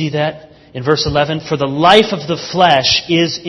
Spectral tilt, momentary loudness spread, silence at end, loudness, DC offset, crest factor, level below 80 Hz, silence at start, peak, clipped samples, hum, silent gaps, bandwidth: -4.5 dB/octave; 11 LU; 0 s; -13 LUFS; under 0.1%; 14 dB; -42 dBFS; 0 s; 0 dBFS; 0.2%; none; none; 11 kHz